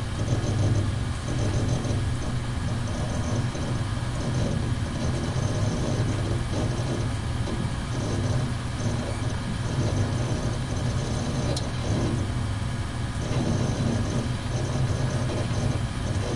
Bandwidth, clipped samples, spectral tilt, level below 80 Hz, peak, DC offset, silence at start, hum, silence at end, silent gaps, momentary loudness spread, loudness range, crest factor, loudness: 11.5 kHz; under 0.1%; -6 dB/octave; -36 dBFS; -12 dBFS; 0.3%; 0 s; none; 0 s; none; 3 LU; 1 LU; 14 dB; -27 LUFS